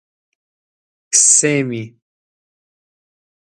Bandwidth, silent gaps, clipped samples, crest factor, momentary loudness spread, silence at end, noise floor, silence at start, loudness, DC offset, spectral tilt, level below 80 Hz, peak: 16 kHz; none; under 0.1%; 20 dB; 15 LU; 1.7 s; under -90 dBFS; 1.1 s; -12 LUFS; under 0.1%; -2.5 dB/octave; -70 dBFS; 0 dBFS